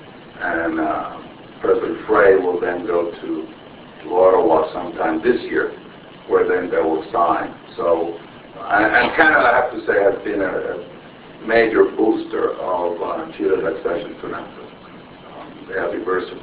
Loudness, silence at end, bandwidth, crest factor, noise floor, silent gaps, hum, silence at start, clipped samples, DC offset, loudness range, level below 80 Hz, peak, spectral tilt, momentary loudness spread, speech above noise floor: -18 LUFS; 0 s; 4 kHz; 18 dB; -40 dBFS; none; none; 0 s; under 0.1%; under 0.1%; 6 LU; -52 dBFS; 0 dBFS; -9 dB/octave; 22 LU; 22 dB